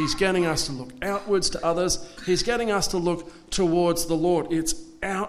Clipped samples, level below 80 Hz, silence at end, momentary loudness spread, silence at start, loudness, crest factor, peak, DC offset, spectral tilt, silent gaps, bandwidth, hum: under 0.1%; -42 dBFS; 0 s; 8 LU; 0 s; -25 LUFS; 16 dB; -10 dBFS; under 0.1%; -4 dB/octave; none; 14.5 kHz; none